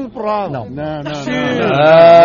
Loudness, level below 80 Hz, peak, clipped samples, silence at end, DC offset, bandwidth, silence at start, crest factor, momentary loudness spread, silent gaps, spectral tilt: -13 LUFS; -46 dBFS; 0 dBFS; under 0.1%; 0 s; under 0.1%; 7.2 kHz; 0 s; 12 dB; 16 LU; none; -6.5 dB/octave